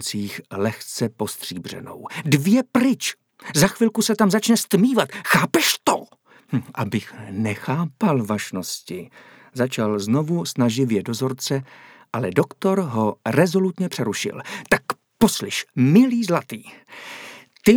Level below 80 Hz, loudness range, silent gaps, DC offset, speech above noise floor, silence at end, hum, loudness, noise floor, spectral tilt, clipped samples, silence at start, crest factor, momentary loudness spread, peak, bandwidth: -56 dBFS; 5 LU; none; under 0.1%; 28 dB; 0 s; none; -21 LUFS; -49 dBFS; -5 dB/octave; under 0.1%; 0 s; 18 dB; 15 LU; -2 dBFS; over 20 kHz